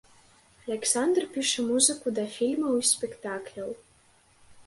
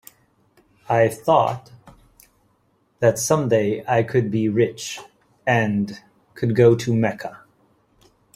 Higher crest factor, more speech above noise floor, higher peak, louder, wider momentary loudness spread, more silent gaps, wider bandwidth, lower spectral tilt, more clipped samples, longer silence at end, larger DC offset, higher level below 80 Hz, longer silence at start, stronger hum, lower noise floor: about the same, 22 dB vs 20 dB; second, 34 dB vs 45 dB; second, -8 dBFS vs -2 dBFS; second, -26 LUFS vs -20 LUFS; about the same, 16 LU vs 15 LU; neither; second, 12 kHz vs 15.5 kHz; second, -1.5 dB/octave vs -6 dB/octave; neither; second, 0.05 s vs 1 s; neither; second, -70 dBFS vs -58 dBFS; second, 0.65 s vs 0.9 s; neither; about the same, -61 dBFS vs -64 dBFS